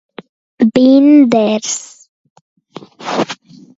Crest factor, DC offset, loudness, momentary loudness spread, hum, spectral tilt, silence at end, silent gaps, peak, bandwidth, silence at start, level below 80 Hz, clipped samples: 14 dB; under 0.1%; -12 LUFS; 15 LU; none; -4.5 dB/octave; 0.45 s; 2.08-2.24 s, 2.30-2.56 s; 0 dBFS; 8 kHz; 0.6 s; -58 dBFS; under 0.1%